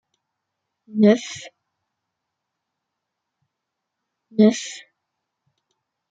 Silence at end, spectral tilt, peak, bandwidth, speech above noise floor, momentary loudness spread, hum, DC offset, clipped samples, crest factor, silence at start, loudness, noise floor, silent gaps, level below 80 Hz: 1.35 s; -5.5 dB/octave; -4 dBFS; 9 kHz; 63 dB; 18 LU; none; under 0.1%; under 0.1%; 22 dB; 0.95 s; -19 LUFS; -81 dBFS; none; -72 dBFS